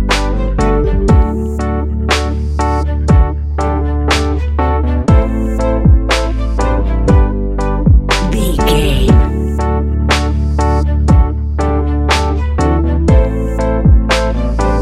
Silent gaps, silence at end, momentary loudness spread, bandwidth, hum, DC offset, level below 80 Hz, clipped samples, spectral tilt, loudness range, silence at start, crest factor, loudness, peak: none; 0 s; 5 LU; 13 kHz; none; under 0.1%; -14 dBFS; under 0.1%; -6.5 dB/octave; 1 LU; 0 s; 12 dB; -13 LUFS; 0 dBFS